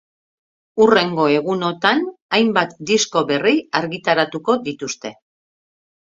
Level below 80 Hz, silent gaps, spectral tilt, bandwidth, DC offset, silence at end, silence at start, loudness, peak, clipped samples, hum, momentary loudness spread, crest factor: -62 dBFS; 2.22-2.29 s; -4 dB/octave; 7.8 kHz; under 0.1%; 0.9 s; 0.75 s; -18 LUFS; 0 dBFS; under 0.1%; none; 12 LU; 20 dB